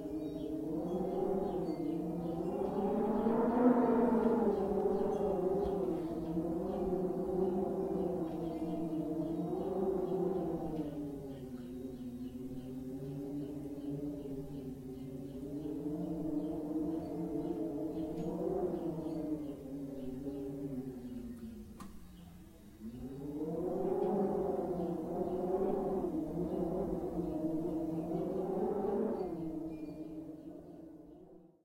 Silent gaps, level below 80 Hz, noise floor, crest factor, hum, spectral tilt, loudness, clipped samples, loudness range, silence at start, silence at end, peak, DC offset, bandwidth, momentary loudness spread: none; -58 dBFS; -58 dBFS; 20 dB; none; -9 dB/octave; -37 LUFS; under 0.1%; 11 LU; 0 s; 0.2 s; -16 dBFS; under 0.1%; 16.5 kHz; 12 LU